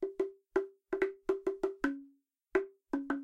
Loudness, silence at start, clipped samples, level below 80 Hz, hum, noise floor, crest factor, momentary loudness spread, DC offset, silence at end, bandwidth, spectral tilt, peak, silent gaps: -37 LUFS; 0 s; under 0.1%; -66 dBFS; none; -66 dBFS; 20 dB; 5 LU; under 0.1%; 0 s; 8.4 kHz; -5.5 dB/octave; -16 dBFS; none